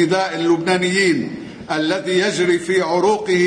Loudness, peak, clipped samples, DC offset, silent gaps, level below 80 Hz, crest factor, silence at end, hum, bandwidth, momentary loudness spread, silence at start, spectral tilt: -17 LUFS; -4 dBFS; under 0.1%; under 0.1%; none; -58 dBFS; 12 dB; 0 s; none; 10 kHz; 6 LU; 0 s; -4.5 dB/octave